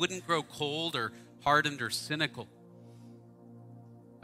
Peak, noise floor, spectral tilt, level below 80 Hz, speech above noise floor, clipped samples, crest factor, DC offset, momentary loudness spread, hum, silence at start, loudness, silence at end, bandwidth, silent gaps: -12 dBFS; -53 dBFS; -3.5 dB/octave; -68 dBFS; 20 dB; under 0.1%; 22 dB; under 0.1%; 26 LU; none; 0 s; -31 LUFS; 0.1 s; 16 kHz; none